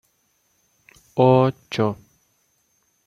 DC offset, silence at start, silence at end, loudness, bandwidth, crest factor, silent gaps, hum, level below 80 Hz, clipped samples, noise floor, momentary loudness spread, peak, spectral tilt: under 0.1%; 1.15 s; 1.15 s; -20 LUFS; 7.4 kHz; 20 dB; none; none; -60 dBFS; under 0.1%; -67 dBFS; 14 LU; -4 dBFS; -8 dB/octave